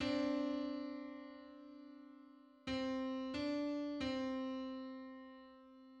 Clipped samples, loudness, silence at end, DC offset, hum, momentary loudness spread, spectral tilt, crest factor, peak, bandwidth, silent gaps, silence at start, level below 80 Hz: under 0.1%; -42 LUFS; 0 s; under 0.1%; none; 19 LU; -5.5 dB/octave; 16 dB; -28 dBFS; 8.6 kHz; none; 0 s; -70 dBFS